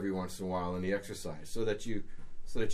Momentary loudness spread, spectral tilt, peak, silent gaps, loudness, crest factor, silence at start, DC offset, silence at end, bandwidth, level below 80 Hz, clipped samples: 10 LU; -5.5 dB/octave; -18 dBFS; none; -37 LUFS; 14 dB; 0 s; under 0.1%; 0 s; 14.5 kHz; -46 dBFS; under 0.1%